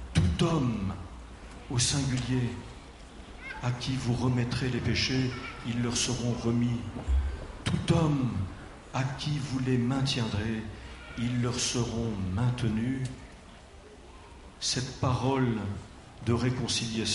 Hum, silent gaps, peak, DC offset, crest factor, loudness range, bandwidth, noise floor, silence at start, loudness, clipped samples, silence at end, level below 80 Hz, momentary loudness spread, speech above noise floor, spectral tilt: none; none; -12 dBFS; under 0.1%; 18 dB; 3 LU; 11.5 kHz; -50 dBFS; 0 s; -30 LUFS; under 0.1%; 0 s; -42 dBFS; 19 LU; 21 dB; -5 dB/octave